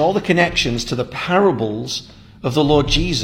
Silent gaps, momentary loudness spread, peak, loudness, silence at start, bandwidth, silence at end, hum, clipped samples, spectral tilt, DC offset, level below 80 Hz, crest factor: none; 10 LU; 0 dBFS; -18 LUFS; 0 s; 16 kHz; 0 s; none; under 0.1%; -5 dB/octave; under 0.1%; -32 dBFS; 16 dB